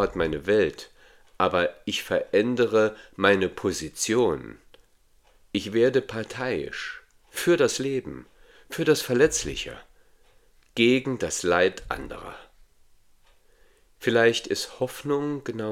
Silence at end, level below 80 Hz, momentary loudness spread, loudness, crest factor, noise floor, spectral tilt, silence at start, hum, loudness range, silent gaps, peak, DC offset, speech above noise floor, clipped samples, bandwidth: 0 s; -52 dBFS; 15 LU; -25 LUFS; 24 dB; -60 dBFS; -4 dB/octave; 0 s; none; 4 LU; none; -2 dBFS; under 0.1%; 36 dB; under 0.1%; 16.5 kHz